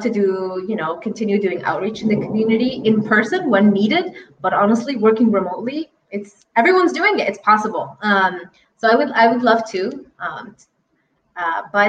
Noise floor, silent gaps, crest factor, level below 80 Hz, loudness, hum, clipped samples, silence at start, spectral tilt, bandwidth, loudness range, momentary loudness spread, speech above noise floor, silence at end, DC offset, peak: -66 dBFS; none; 16 dB; -62 dBFS; -17 LUFS; none; under 0.1%; 0 s; -6 dB/octave; 8.6 kHz; 3 LU; 14 LU; 48 dB; 0 s; under 0.1%; -2 dBFS